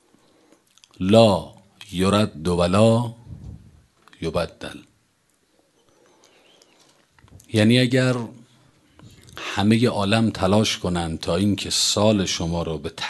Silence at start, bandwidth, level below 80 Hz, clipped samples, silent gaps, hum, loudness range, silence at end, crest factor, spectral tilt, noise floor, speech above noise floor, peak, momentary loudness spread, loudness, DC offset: 1 s; 12.5 kHz; -44 dBFS; under 0.1%; none; none; 14 LU; 0 s; 22 dB; -5 dB/octave; -65 dBFS; 45 dB; 0 dBFS; 19 LU; -20 LUFS; under 0.1%